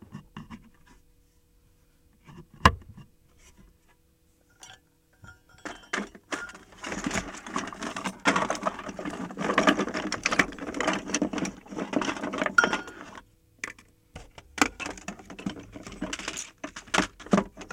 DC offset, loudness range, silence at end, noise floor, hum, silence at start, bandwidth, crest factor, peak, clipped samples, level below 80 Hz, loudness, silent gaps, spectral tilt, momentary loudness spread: under 0.1%; 10 LU; 0 s; -64 dBFS; none; 0.1 s; 16.5 kHz; 26 dB; -4 dBFS; under 0.1%; -50 dBFS; -29 LUFS; none; -3.5 dB/octave; 22 LU